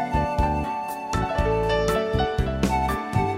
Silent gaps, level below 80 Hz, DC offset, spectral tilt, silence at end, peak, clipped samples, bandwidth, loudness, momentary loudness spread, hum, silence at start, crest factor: none; -32 dBFS; under 0.1%; -6 dB/octave; 0 s; -10 dBFS; under 0.1%; 16 kHz; -24 LUFS; 5 LU; none; 0 s; 14 dB